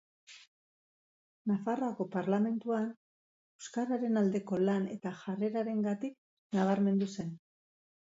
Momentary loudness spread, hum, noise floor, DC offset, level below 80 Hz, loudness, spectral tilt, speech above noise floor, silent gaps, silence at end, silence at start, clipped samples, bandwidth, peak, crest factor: 11 LU; none; under -90 dBFS; under 0.1%; -80 dBFS; -34 LUFS; -7.5 dB/octave; over 58 dB; 0.47-1.45 s, 2.97-3.59 s, 6.18-6.50 s; 0.65 s; 0.3 s; under 0.1%; 7.8 kHz; -16 dBFS; 18 dB